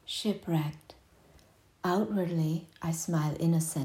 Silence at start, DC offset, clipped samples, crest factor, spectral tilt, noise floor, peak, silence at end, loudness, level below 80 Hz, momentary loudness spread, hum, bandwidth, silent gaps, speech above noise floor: 0.05 s; under 0.1%; under 0.1%; 14 dB; -5.5 dB/octave; -61 dBFS; -18 dBFS; 0 s; -31 LUFS; -66 dBFS; 7 LU; none; 16 kHz; none; 31 dB